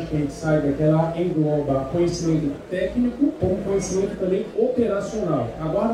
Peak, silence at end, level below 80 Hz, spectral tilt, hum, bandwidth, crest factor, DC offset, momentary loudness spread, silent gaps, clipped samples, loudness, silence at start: -8 dBFS; 0 s; -42 dBFS; -7 dB/octave; none; 11.5 kHz; 14 dB; under 0.1%; 5 LU; none; under 0.1%; -22 LUFS; 0 s